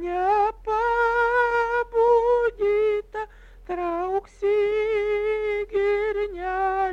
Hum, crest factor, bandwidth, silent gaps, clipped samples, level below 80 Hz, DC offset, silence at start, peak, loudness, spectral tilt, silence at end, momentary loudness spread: none; 12 dB; 7.8 kHz; none; under 0.1%; -46 dBFS; under 0.1%; 0 s; -10 dBFS; -23 LUFS; -5.5 dB/octave; 0 s; 8 LU